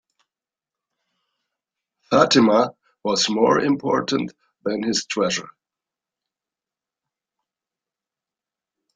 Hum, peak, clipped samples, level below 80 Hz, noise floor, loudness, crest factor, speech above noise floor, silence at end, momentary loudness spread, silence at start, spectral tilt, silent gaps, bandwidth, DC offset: none; -2 dBFS; under 0.1%; -64 dBFS; -90 dBFS; -20 LUFS; 22 dB; 71 dB; 3.55 s; 12 LU; 2.1 s; -4 dB/octave; none; 9.6 kHz; under 0.1%